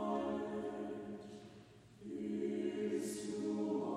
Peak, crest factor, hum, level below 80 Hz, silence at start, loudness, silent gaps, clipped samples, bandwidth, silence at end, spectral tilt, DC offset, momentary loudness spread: -28 dBFS; 14 dB; none; -74 dBFS; 0 s; -41 LUFS; none; under 0.1%; 15 kHz; 0 s; -6 dB/octave; under 0.1%; 16 LU